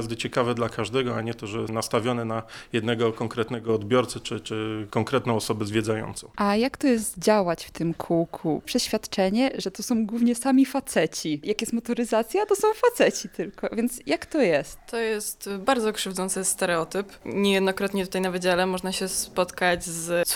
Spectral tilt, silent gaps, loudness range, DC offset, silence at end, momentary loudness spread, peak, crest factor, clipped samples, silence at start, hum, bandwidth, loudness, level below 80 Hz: -4.5 dB/octave; none; 3 LU; under 0.1%; 0 s; 8 LU; -8 dBFS; 18 dB; under 0.1%; 0 s; none; over 20 kHz; -25 LUFS; -54 dBFS